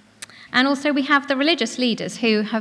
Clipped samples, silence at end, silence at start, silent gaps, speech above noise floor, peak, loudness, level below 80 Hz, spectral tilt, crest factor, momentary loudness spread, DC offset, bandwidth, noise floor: under 0.1%; 0 s; 0.2 s; none; 22 dB; -4 dBFS; -20 LUFS; -68 dBFS; -3.5 dB/octave; 16 dB; 5 LU; under 0.1%; 11 kHz; -42 dBFS